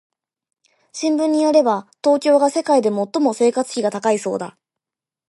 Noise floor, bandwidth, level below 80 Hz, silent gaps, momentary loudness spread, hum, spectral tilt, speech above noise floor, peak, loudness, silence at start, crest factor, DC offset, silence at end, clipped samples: -89 dBFS; 11.5 kHz; -74 dBFS; none; 10 LU; none; -4.5 dB/octave; 72 dB; -2 dBFS; -18 LUFS; 0.95 s; 16 dB; under 0.1%; 0.8 s; under 0.1%